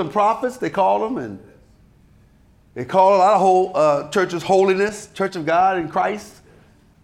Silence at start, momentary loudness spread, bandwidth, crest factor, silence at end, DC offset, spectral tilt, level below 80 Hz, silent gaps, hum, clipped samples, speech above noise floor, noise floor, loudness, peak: 0 s; 12 LU; 13 kHz; 16 dB; 0.75 s; under 0.1%; -5.5 dB/octave; -58 dBFS; none; none; under 0.1%; 35 dB; -53 dBFS; -18 LUFS; -4 dBFS